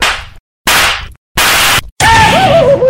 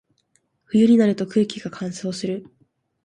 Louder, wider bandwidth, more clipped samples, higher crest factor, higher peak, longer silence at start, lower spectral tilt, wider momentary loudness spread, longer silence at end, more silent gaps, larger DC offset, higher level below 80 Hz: first, -8 LUFS vs -21 LUFS; first, 17.5 kHz vs 9.8 kHz; first, 0.2% vs under 0.1%; second, 10 dB vs 16 dB; first, 0 dBFS vs -6 dBFS; second, 0 s vs 0.75 s; second, -2.5 dB/octave vs -6.5 dB/octave; second, 11 LU vs 14 LU; second, 0 s vs 0.65 s; first, 0.40-0.65 s, 1.17-1.35 s, 1.92-1.96 s vs none; neither; first, -28 dBFS vs -64 dBFS